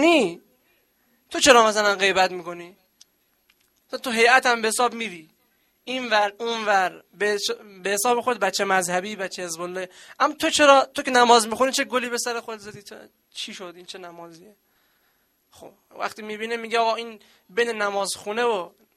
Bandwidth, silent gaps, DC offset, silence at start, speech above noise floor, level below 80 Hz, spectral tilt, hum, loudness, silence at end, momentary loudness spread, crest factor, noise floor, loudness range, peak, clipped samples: 16 kHz; none; under 0.1%; 0 s; 44 dB; -64 dBFS; -2 dB/octave; none; -21 LUFS; 0.3 s; 21 LU; 24 dB; -67 dBFS; 14 LU; 0 dBFS; under 0.1%